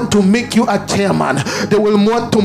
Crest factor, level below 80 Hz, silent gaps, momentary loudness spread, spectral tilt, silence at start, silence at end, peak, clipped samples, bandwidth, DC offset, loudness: 12 dB; -44 dBFS; none; 3 LU; -5.5 dB/octave; 0 s; 0 s; 0 dBFS; under 0.1%; 15 kHz; under 0.1%; -14 LUFS